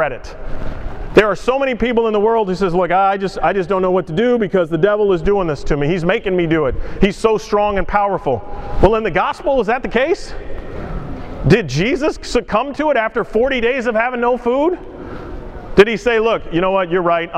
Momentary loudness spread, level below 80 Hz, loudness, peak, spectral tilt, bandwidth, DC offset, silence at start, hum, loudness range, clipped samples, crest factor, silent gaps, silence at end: 15 LU; -30 dBFS; -16 LUFS; 0 dBFS; -6.5 dB/octave; 10 kHz; under 0.1%; 0 s; none; 2 LU; under 0.1%; 16 dB; none; 0 s